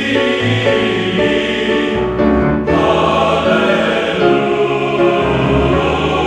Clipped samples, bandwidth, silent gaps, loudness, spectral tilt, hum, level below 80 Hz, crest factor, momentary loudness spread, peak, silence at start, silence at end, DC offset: under 0.1%; 10.5 kHz; none; -13 LUFS; -6 dB/octave; none; -30 dBFS; 12 dB; 2 LU; 0 dBFS; 0 s; 0 s; under 0.1%